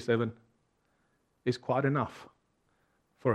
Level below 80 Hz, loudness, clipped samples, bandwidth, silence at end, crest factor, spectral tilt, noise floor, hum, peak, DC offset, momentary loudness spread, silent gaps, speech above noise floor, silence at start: -72 dBFS; -32 LUFS; under 0.1%; 10.5 kHz; 0 s; 22 dB; -7.5 dB/octave; -74 dBFS; none; -12 dBFS; under 0.1%; 9 LU; none; 43 dB; 0 s